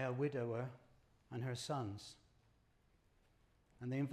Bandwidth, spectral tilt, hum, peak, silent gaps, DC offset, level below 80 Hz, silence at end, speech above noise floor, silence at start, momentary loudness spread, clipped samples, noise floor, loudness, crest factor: 13.5 kHz; -6.5 dB/octave; none; -26 dBFS; none; under 0.1%; -76 dBFS; 0 s; 32 dB; 0 s; 13 LU; under 0.1%; -74 dBFS; -44 LUFS; 18 dB